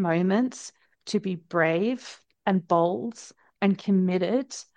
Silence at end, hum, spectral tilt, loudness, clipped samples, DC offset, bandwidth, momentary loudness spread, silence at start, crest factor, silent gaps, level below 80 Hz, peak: 0.15 s; none; -6.5 dB/octave; -26 LUFS; under 0.1%; under 0.1%; 9.4 kHz; 17 LU; 0 s; 18 dB; none; -74 dBFS; -8 dBFS